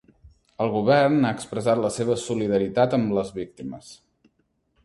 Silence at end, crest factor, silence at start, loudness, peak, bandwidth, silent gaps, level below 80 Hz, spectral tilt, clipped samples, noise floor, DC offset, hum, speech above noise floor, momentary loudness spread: 0.9 s; 18 dB; 0.6 s; -23 LUFS; -6 dBFS; 11.5 kHz; none; -58 dBFS; -6 dB/octave; under 0.1%; -70 dBFS; under 0.1%; none; 47 dB; 16 LU